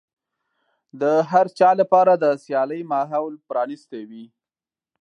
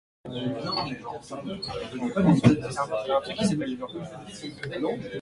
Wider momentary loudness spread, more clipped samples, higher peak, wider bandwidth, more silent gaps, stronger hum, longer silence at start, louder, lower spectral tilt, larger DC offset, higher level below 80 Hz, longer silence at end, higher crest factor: about the same, 18 LU vs 16 LU; neither; about the same, -2 dBFS vs -4 dBFS; second, 9.8 kHz vs 11.5 kHz; neither; neither; first, 0.95 s vs 0.25 s; first, -20 LUFS vs -27 LUFS; about the same, -7 dB/octave vs -6.5 dB/octave; neither; second, -80 dBFS vs -54 dBFS; first, 0.75 s vs 0 s; second, 18 dB vs 24 dB